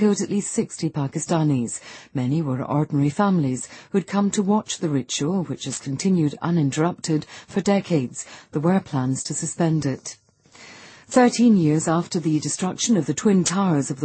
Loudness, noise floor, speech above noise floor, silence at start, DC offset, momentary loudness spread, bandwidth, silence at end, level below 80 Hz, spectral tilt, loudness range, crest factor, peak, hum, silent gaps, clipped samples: -22 LUFS; -48 dBFS; 26 dB; 0 s; under 0.1%; 10 LU; 8.8 kHz; 0 s; -60 dBFS; -5.5 dB/octave; 3 LU; 16 dB; -6 dBFS; none; none; under 0.1%